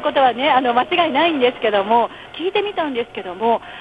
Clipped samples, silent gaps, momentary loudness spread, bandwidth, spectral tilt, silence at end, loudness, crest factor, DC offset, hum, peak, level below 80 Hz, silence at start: under 0.1%; none; 9 LU; 8.8 kHz; -5.5 dB/octave; 0 s; -18 LUFS; 16 dB; under 0.1%; none; -2 dBFS; -58 dBFS; 0 s